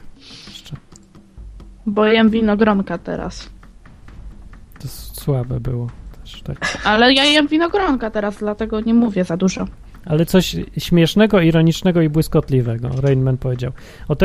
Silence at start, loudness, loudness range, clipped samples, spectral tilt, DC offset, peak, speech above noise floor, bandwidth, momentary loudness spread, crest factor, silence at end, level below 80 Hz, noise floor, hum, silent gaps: 0.05 s; -17 LUFS; 9 LU; under 0.1%; -6 dB/octave; under 0.1%; 0 dBFS; 28 dB; 15.5 kHz; 21 LU; 18 dB; 0 s; -36 dBFS; -44 dBFS; none; none